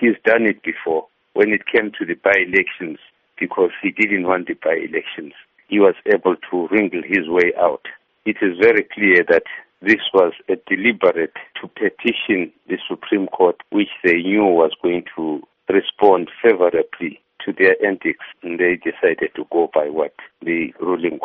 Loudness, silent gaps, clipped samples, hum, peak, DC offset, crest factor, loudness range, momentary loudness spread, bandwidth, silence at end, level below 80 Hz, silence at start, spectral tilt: -18 LUFS; none; under 0.1%; none; 0 dBFS; under 0.1%; 18 dB; 3 LU; 12 LU; 6.6 kHz; 0 s; -60 dBFS; 0 s; -2.5 dB/octave